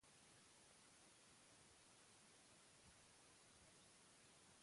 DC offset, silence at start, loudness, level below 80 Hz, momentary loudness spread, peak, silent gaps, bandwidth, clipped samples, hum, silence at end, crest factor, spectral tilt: under 0.1%; 0 s; -68 LUFS; -88 dBFS; 0 LU; -56 dBFS; none; 11.5 kHz; under 0.1%; none; 0 s; 14 dB; -2 dB/octave